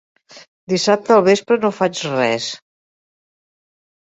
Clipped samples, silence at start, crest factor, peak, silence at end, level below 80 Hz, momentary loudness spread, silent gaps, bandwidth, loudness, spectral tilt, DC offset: under 0.1%; 0.35 s; 18 dB; -2 dBFS; 1.5 s; -64 dBFS; 10 LU; 0.48-0.67 s; 8.2 kHz; -17 LUFS; -4.5 dB/octave; under 0.1%